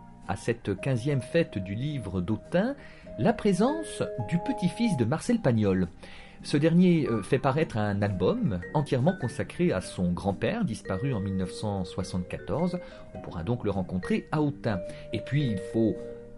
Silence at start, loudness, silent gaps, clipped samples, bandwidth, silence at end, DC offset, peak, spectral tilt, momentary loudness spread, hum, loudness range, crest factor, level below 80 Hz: 0 s; -28 LUFS; none; under 0.1%; 11.5 kHz; 0 s; under 0.1%; -12 dBFS; -7 dB/octave; 9 LU; none; 5 LU; 16 dB; -50 dBFS